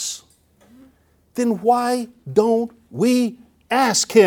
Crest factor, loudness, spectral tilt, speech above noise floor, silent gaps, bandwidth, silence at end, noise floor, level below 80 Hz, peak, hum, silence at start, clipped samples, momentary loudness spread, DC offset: 18 dB; -20 LUFS; -3.5 dB/octave; 38 dB; none; 18.5 kHz; 0 s; -56 dBFS; -62 dBFS; -2 dBFS; none; 0 s; under 0.1%; 11 LU; under 0.1%